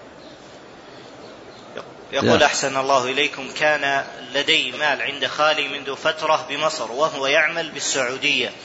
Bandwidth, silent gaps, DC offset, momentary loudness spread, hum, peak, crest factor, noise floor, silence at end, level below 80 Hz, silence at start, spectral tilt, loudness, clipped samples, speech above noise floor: 8 kHz; none; under 0.1%; 20 LU; none; -4 dBFS; 18 dB; -42 dBFS; 0 s; -60 dBFS; 0 s; -2 dB/octave; -20 LUFS; under 0.1%; 21 dB